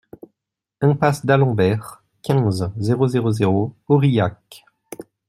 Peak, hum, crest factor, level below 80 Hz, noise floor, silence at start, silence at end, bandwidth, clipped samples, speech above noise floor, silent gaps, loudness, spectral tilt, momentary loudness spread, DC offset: -2 dBFS; none; 18 dB; -56 dBFS; -83 dBFS; 0.8 s; 0.25 s; 13.5 kHz; under 0.1%; 66 dB; none; -19 LUFS; -7.5 dB/octave; 16 LU; under 0.1%